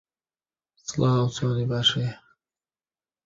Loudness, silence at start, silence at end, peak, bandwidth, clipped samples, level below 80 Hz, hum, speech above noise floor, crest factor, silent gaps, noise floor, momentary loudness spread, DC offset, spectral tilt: -24 LUFS; 0.85 s; 1.1 s; -8 dBFS; 7.8 kHz; under 0.1%; -58 dBFS; none; over 66 dB; 18 dB; none; under -90 dBFS; 11 LU; under 0.1%; -5 dB/octave